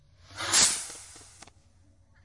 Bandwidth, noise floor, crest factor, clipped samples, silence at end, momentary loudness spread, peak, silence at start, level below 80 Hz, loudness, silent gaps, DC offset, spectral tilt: 11.5 kHz; -61 dBFS; 22 dB; under 0.1%; 1 s; 26 LU; -8 dBFS; 0.3 s; -62 dBFS; -23 LUFS; none; under 0.1%; 1 dB/octave